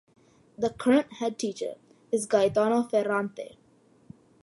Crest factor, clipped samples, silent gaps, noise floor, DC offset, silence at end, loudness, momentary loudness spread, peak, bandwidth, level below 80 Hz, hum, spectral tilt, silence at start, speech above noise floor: 18 dB; under 0.1%; none; -61 dBFS; under 0.1%; 1 s; -27 LUFS; 13 LU; -10 dBFS; 11.5 kHz; -66 dBFS; none; -5 dB/octave; 0.6 s; 35 dB